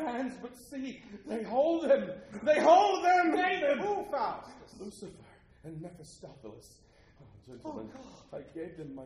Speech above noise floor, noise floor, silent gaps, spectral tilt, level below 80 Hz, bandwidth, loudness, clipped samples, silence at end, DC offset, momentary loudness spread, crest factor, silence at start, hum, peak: 27 dB; -58 dBFS; none; -5 dB/octave; -66 dBFS; 12 kHz; -29 LUFS; under 0.1%; 0 s; under 0.1%; 24 LU; 20 dB; 0 s; none; -12 dBFS